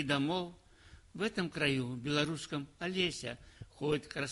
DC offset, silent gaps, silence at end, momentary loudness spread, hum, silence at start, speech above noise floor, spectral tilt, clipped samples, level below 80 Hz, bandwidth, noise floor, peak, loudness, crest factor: under 0.1%; none; 0 s; 13 LU; none; 0 s; 23 dB; -5 dB/octave; under 0.1%; -62 dBFS; 11.5 kHz; -59 dBFS; -18 dBFS; -35 LUFS; 18 dB